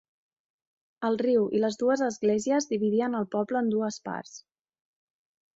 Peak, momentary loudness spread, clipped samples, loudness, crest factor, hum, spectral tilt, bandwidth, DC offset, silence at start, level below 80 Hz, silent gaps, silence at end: -14 dBFS; 10 LU; under 0.1%; -27 LUFS; 14 dB; none; -5.5 dB/octave; 8 kHz; under 0.1%; 1 s; -72 dBFS; none; 1.2 s